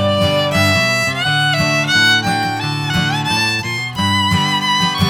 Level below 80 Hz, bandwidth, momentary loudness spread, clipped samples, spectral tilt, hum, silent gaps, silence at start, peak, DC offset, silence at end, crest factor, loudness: -42 dBFS; over 20 kHz; 6 LU; under 0.1%; -4 dB/octave; none; none; 0 s; -2 dBFS; under 0.1%; 0 s; 14 dB; -14 LUFS